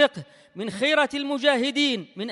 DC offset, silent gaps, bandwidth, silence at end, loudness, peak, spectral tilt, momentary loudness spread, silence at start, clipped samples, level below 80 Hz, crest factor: under 0.1%; none; 11.5 kHz; 0 s; -23 LUFS; -6 dBFS; -3.5 dB/octave; 14 LU; 0 s; under 0.1%; -72 dBFS; 18 dB